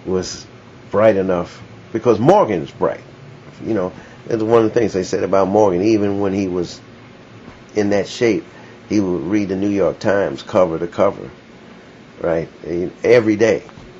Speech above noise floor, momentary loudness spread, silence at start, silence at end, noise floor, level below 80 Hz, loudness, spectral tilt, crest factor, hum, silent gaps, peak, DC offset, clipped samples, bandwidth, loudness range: 24 dB; 13 LU; 0 s; 0 s; -41 dBFS; -52 dBFS; -17 LUFS; -6.5 dB/octave; 18 dB; none; none; 0 dBFS; under 0.1%; under 0.1%; 7.8 kHz; 3 LU